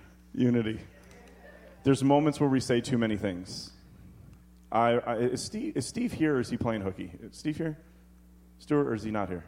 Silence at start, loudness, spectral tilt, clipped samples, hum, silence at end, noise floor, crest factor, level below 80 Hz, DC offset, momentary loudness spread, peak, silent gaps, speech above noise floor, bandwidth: 0.05 s; -29 LUFS; -6 dB/octave; under 0.1%; none; 0 s; -55 dBFS; 20 dB; -56 dBFS; under 0.1%; 15 LU; -10 dBFS; none; 27 dB; 15.5 kHz